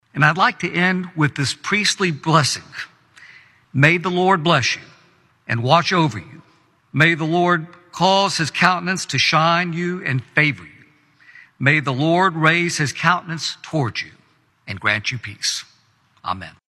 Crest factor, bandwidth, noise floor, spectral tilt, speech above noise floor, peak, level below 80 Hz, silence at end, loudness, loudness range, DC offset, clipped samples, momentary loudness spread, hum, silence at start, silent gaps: 20 dB; 13 kHz; -58 dBFS; -4.5 dB/octave; 40 dB; 0 dBFS; -60 dBFS; 0.2 s; -18 LUFS; 3 LU; under 0.1%; under 0.1%; 13 LU; none; 0.15 s; none